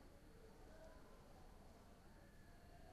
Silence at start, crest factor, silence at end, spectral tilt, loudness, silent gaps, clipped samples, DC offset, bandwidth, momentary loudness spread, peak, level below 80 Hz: 0 s; 12 dB; 0 s; -5.5 dB/octave; -65 LUFS; none; under 0.1%; under 0.1%; 13 kHz; 3 LU; -50 dBFS; -66 dBFS